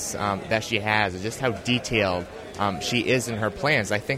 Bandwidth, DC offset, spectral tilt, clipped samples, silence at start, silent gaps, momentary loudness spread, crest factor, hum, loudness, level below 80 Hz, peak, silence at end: 16 kHz; under 0.1%; -4 dB/octave; under 0.1%; 0 s; none; 6 LU; 20 dB; none; -24 LUFS; -50 dBFS; -6 dBFS; 0 s